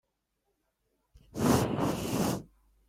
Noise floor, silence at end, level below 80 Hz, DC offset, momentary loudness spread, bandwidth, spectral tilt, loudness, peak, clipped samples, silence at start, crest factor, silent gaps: -80 dBFS; 0.45 s; -54 dBFS; under 0.1%; 10 LU; 16 kHz; -5.5 dB/octave; -30 LUFS; -10 dBFS; under 0.1%; 1.35 s; 24 dB; none